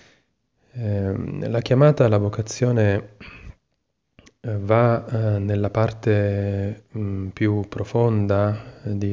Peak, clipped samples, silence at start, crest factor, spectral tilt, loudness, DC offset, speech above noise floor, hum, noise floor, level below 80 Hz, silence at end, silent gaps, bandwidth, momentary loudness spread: -6 dBFS; under 0.1%; 0.75 s; 16 dB; -8 dB/octave; -22 LUFS; under 0.1%; 54 dB; none; -74 dBFS; -44 dBFS; 0 s; none; 7.4 kHz; 12 LU